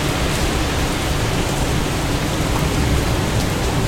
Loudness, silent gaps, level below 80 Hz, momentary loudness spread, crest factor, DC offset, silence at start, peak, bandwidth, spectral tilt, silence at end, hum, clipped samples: -19 LUFS; none; -24 dBFS; 2 LU; 14 dB; under 0.1%; 0 s; -4 dBFS; 16.5 kHz; -4.5 dB/octave; 0 s; none; under 0.1%